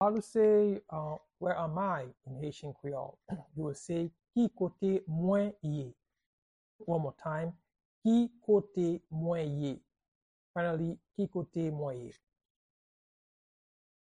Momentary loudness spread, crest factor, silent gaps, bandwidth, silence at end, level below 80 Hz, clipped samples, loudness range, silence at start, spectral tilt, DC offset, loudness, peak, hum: 13 LU; 16 dB; 6.26-6.79 s, 7.85-8.02 s, 10.08-10.54 s; 10.5 kHz; 1.9 s; -70 dBFS; under 0.1%; 6 LU; 0 s; -8 dB/octave; under 0.1%; -34 LUFS; -18 dBFS; none